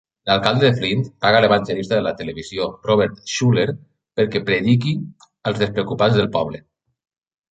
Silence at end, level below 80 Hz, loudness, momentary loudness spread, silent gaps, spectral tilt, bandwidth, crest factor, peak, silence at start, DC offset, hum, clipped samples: 0.9 s; -50 dBFS; -19 LUFS; 12 LU; none; -6 dB/octave; 8.8 kHz; 18 dB; 0 dBFS; 0.25 s; under 0.1%; none; under 0.1%